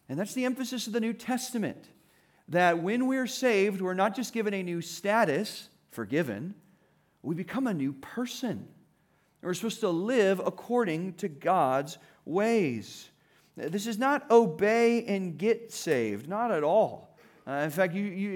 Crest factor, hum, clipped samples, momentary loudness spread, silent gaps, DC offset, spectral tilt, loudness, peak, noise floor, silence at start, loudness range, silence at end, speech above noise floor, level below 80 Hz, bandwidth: 20 dB; none; under 0.1%; 13 LU; none; under 0.1%; -5 dB/octave; -29 LUFS; -10 dBFS; -68 dBFS; 0.1 s; 7 LU; 0 s; 40 dB; -80 dBFS; 18.5 kHz